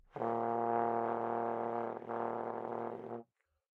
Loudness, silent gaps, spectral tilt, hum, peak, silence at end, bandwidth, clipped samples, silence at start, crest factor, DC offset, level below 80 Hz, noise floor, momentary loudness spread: -37 LUFS; none; -9 dB/octave; none; -18 dBFS; 0.55 s; 5.2 kHz; under 0.1%; 0.15 s; 18 dB; under 0.1%; -80 dBFS; -61 dBFS; 9 LU